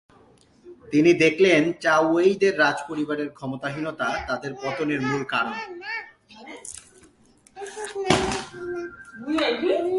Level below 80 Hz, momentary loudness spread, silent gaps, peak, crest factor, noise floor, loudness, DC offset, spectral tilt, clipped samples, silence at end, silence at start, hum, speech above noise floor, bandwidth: -54 dBFS; 19 LU; none; -2 dBFS; 22 dB; -57 dBFS; -23 LUFS; under 0.1%; -4.5 dB/octave; under 0.1%; 0 s; 0.65 s; none; 34 dB; 11.5 kHz